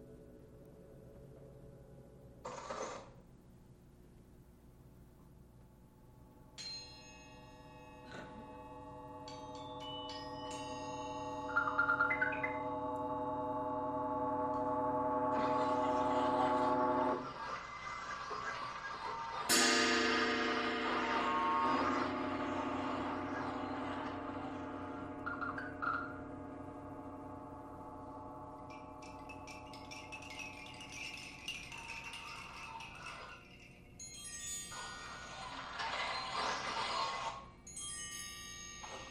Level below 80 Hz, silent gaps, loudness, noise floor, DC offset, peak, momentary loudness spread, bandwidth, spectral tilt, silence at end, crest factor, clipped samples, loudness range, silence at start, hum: -64 dBFS; none; -38 LUFS; -61 dBFS; under 0.1%; -18 dBFS; 20 LU; 16 kHz; -3 dB/octave; 0 s; 22 dB; under 0.1%; 17 LU; 0 s; 60 Hz at -65 dBFS